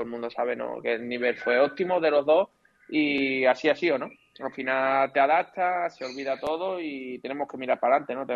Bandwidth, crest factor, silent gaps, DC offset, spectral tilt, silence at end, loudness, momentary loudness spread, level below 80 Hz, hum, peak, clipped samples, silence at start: 7.4 kHz; 16 dB; none; under 0.1%; -5.5 dB/octave; 0 s; -26 LUFS; 11 LU; -72 dBFS; none; -10 dBFS; under 0.1%; 0 s